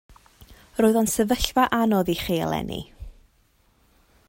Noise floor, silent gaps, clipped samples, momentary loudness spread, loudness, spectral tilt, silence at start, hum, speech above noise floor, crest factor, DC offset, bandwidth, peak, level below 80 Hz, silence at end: -63 dBFS; none; under 0.1%; 14 LU; -23 LUFS; -4.5 dB/octave; 0.4 s; none; 41 dB; 22 dB; under 0.1%; 16.5 kHz; -2 dBFS; -44 dBFS; 1.2 s